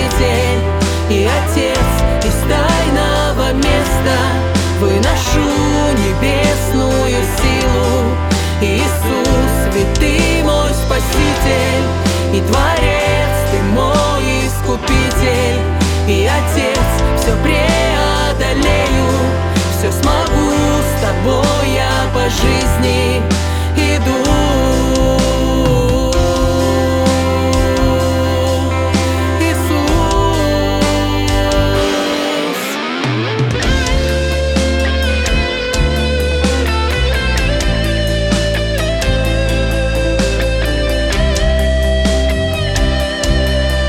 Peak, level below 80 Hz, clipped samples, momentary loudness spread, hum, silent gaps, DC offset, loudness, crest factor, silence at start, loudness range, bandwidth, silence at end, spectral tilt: 0 dBFS; -18 dBFS; under 0.1%; 3 LU; none; none; under 0.1%; -14 LUFS; 12 dB; 0 s; 2 LU; 18 kHz; 0 s; -5 dB/octave